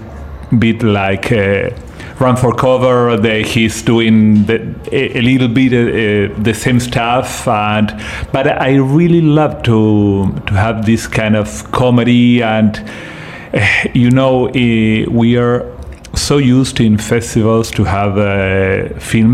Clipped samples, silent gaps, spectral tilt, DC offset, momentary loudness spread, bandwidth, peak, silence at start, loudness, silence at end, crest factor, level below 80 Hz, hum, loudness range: under 0.1%; none; -6 dB/octave; under 0.1%; 8 LU; 14.5 kHz; 0 dBFS; 0 s; -12 LUFS; 0 s; 10 dB; -34 dBFS; none; 1 LU